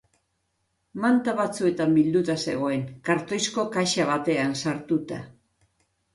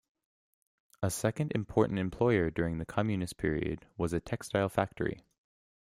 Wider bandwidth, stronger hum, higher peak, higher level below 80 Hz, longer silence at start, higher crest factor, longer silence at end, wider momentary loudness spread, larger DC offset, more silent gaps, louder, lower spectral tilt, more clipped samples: second, 11.5 kHz vs 15.5 kHz; neither; about the same, -10 dBFS vs -12 dBFS; second, -64 dBFS vs -54 dBFS; about the same, 0.95 s vs 1 s; about the same, 16 dB vs 20 dB; first, 0.85 s vs 0.65 s; about the same, 7 LU vs 8 LU; neither; neither; first, -25 LUFS vs -32 LUFS; second, -5 dB/octave vs -6.5 dB/octave; neither